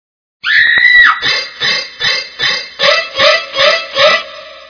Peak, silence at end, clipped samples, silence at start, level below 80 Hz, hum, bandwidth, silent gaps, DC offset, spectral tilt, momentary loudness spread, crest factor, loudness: 0 dBFS; 0.1 s; 0.4%; 0.45 s; -50 dBFS; none; 5.4 kHz; none; under 0.1%; -0.5 dB/octave; 9 LU; 12 dB; -9 LUFS